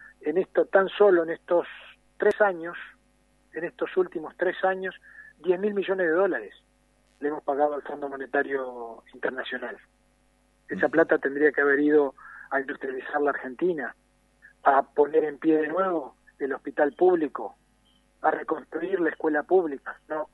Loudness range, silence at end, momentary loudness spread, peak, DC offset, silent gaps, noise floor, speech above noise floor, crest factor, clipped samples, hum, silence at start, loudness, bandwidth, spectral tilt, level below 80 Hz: 6 LU; 0.05 s; 15 LU; -6 dBFS; under 0.1%; none; -65 dBFS; 39 dB; 20 dB; under 0.1%; 50 Hz at -70 dBFS; 0 s; -26 LUFS; 4.3 kHz; -7 dB/octave; -68 dBFS